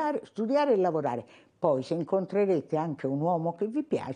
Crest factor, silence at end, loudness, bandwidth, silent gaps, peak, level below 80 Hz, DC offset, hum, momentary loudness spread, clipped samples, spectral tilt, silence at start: 16 dB; 0 s; -29 LUFS; 10 kHz; none; -14 dBFS; -76 dBFS; under 0.1%; none; 7 LU; under 0.1%; -8 dB/octave; 0 s